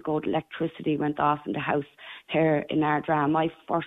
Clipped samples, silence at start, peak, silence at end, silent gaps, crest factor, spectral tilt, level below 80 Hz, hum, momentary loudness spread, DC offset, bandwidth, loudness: under 0.1%; 0.05 s; -10 dBFS; 0 s; none; 16 dB; -9 dB/octave; -62 dBFS; none; 6 LU; under 0.1%; 4 kHz; -26 LUFS